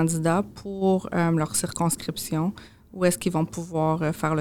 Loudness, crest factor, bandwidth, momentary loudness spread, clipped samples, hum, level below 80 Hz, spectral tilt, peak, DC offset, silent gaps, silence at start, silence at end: -25 LUFS; 16 dB; 18.5 kHz; 6 LU; under 0.1%; none; -54 dBFS; -5.5 dB/octave; -8 dBFS; 0.2%; none; 0 s; 0 s